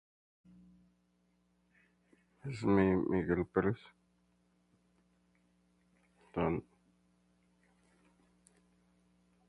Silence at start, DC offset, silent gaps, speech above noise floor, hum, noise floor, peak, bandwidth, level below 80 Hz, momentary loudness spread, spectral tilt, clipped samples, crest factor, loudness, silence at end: 2.45 s; under 0.1%; none; 43 dB; 60 Hz at -65 dBFS; -75 dBFS; -16 dBFS; 10.5 kHz; -60 dBFS; 16 LU; -8.5 dB/octave; under 0.1%; 24 dB; -34 LUFS; 2.9 s